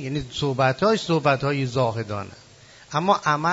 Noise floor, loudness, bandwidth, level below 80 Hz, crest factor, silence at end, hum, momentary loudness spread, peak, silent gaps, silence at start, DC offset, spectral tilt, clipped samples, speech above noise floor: -49 dBFS; -23 LUFS; 8 kHz; -54 dBFS; 18 dB; 0 s; none; 10 LU; -6 dBFS; none; 0 s; under 0.1%; -5.5 dB/octave; under 0.1%; 27 dB